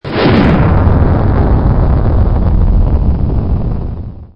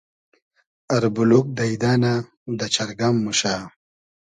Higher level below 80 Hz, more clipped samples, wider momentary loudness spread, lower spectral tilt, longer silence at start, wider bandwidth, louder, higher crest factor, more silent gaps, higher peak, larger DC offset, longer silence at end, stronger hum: first, -14 dBFS vs -58 dBFS; neither; second, 8 LU vs 11 LU; first, -10.5 dB/octave vs -5 dB/octave; second, 0.05 s vs 0.9 s; second, 5.6 kHz vs 11 kHz; first, -12 LUFS vs -21 LUFS; second, 10 dB vs 20 dB; second, none vs 2.37-2.46 s; about the same, 0 dBFS vs -2 dBFS; neither; second, 0.1 s vs 0.65 s; neither